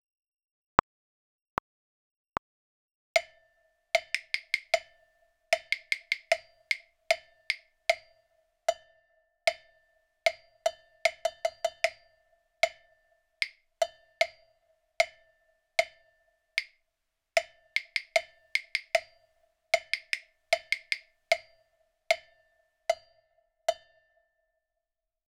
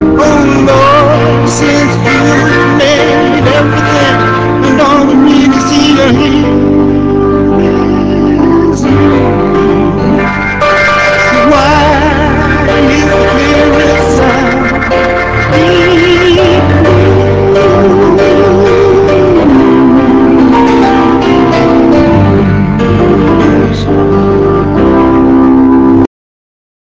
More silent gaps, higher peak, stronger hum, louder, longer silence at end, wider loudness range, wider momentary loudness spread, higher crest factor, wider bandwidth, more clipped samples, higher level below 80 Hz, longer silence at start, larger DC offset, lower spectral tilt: neither; about the same, 0 dBFS vs 0 dBFS; neither; second, -32 LUFS vs -6 LUFS; first, 1.55 s vs 0.8 s; about the same, 4 LU vs 2 LU; about the same, 6 LU vs 4 LU; first, 34 dB vs 6 dB; first, over 20 kHz vs 8 kHz; second, under 0.1% vs 2%; second, -66 dBFS vs -22 dBFS; first, 3.15 s vs 0 s; neither; second, -0.5 dB/octave vs -6.5 dB/octave